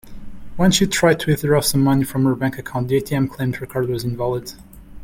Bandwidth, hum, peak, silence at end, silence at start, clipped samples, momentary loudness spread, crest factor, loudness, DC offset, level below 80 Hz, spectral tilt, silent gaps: 17 kHz; none; -2 dBFS; 0 s; 0.05 s; under 0.1%; 9 LU; 16 dB; -19 LUFS; under 0.1%; -42 dBFS; -5 dB/octave; none